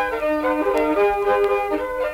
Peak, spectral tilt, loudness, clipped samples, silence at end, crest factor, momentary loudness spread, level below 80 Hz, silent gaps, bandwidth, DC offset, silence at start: -8 dBFS; -5 dB/octave; -20 LUFS; under 0.1%; 0 s; 12 dB; 4 LU; -44 dBFS; none; 16.5 kHz; under 0.1%; 0 s